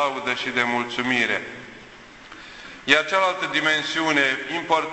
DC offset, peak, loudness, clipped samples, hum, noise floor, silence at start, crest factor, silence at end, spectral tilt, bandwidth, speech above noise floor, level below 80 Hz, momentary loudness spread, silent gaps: under 0.1%; -2 dBFS; -21 LUFS; under 0.1%; none; -44 dBFS; 0 s; 22 dB; 0 s; -3 dB/octave; 8.4 kHz; 22 dB; -60 dBFS; 20 LU; none